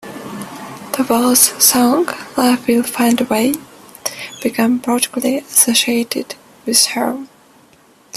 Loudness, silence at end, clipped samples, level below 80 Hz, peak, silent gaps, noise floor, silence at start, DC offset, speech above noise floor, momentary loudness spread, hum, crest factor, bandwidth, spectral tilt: -14 LUFS; 0 s; under 0.1%; -58 dBFS; 0 dBFS; none; -49 dBFS; 0.05 s; under 0.1%; 34 dB; 18 LU; none; 16 dB; 15.5 kHz; -2 dB/octave